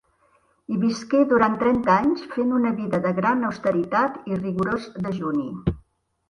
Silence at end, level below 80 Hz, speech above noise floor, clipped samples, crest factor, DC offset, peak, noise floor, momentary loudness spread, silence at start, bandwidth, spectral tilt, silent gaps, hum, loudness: 0.5 s; -48 dBFS; 41 dB; under 0.1%; 18 dB; under 0.1%; -6 dBFS; -63 dBFS; 9 LU; 0.7 s; 10.5 kHz; -7.5 dB/octave; none; none; -23 LUFS